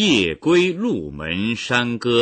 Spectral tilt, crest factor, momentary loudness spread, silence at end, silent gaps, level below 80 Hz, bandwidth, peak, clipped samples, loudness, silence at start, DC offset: -4.5 dB/octave; 14 dB; 7 LU; 0 s; none; -48 dBFS; 9 kHz; -6 dBFS; under 0.1%; -19 LUFS; 0 s; under 0.1%